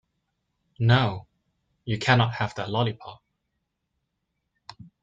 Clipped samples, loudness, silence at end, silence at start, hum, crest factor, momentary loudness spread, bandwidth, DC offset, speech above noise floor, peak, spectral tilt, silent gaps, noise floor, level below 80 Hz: under 0.1%; -24 LUFS; 1.9 s; 0.8 s; none; 22 dB; 20 LU; 7.8 kHz; under 0.1%; 56 dB; -6 dBFS; -6.5 dB/octave; none; -79 dBFS; -58 dBFS